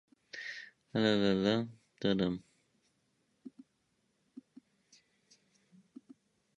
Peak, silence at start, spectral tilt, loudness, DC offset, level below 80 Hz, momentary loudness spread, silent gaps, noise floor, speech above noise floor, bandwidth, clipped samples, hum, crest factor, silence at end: -16 dBFS; 0.35 s; -6.5 dB/octave; -34 LUFS; under 0.1%; -68 dBFS; 26 LU; none; -78 dBFS; 47 dB; 7.8 kHz; under 0.1%; none; 22 dB; 3.1 s